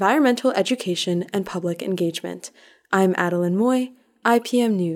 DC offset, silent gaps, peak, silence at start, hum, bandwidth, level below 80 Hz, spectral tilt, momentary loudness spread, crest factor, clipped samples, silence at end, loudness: under 0.1%; none; -4 dBFS; 0 s; none; 17 kHz; -70 dBFS; -5.5 dB/octave; 10 LU; 18 dB; under 0.1%; 0 s; -21 LUFS